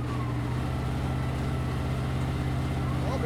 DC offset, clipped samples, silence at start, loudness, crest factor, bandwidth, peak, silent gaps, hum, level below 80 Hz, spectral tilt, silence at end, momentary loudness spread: under 0.1%; under 0.1%; 0 s; -30 LUFS; 12 dB; 13.5 kHz; -18 dBFS; none; none; -36 dBFS; -7 dB/octave; 0 s; 1 LU